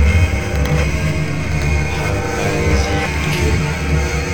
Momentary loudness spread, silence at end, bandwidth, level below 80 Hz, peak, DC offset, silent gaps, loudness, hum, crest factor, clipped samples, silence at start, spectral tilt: 3 LU; 0 s; 17.5 kHz; -22 dBFS; -2 dBFS; 2%; none; -17 LUFS; none; 14 dB; under 0.1%; 0 s; -5.5 dB/octave